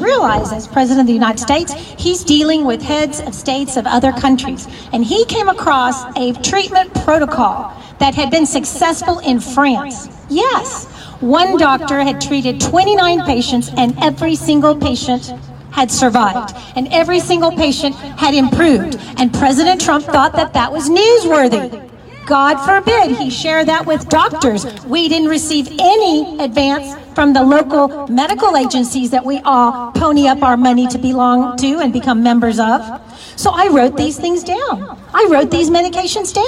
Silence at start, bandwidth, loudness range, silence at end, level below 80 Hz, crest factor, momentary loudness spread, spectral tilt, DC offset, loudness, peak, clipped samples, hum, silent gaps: 0 s; 14 kHz; 2 LU; 0 s; -40 dBFS; 12 dB; 8 LU; -4 dB/octave; under 0.1%; -13 LUFS; 0 dBFS; under 0.1%; none; none